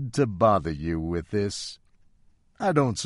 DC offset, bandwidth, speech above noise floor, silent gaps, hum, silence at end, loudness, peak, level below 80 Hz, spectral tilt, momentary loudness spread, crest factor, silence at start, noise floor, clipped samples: under 0.1%; 11.5 kHz; 35 dB; none; none; 0 s; -26 LUFS; -8 dBFS; -46 dBFS; -6 dB/octave; 9 LU; 18 dB; 0 s; -60 dBFS; under 0.1%